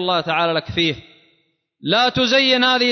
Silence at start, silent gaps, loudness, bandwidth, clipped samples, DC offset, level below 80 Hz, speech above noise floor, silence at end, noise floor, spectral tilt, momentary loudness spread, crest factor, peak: 0 s; none; -16 LUFS; 6.4 kHz; under 0.1%; under 0.1%; -50 dBFS; 47 dB; 0 s; -65 dBFS; -4 dB/octave; 7 LU; 14 dB; -4 dBFS